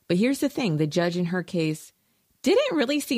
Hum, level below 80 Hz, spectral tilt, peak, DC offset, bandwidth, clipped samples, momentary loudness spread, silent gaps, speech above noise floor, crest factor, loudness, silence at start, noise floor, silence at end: none; -66 dBFS; -5.5 dB/octave; -10 dBFS; under 0.1%; 15.5 kHz; under 0.1%; 7 LU; none; 23 dB; 14 dB; -25 LUFS; 0.1 s; -47 dBFS; 0 s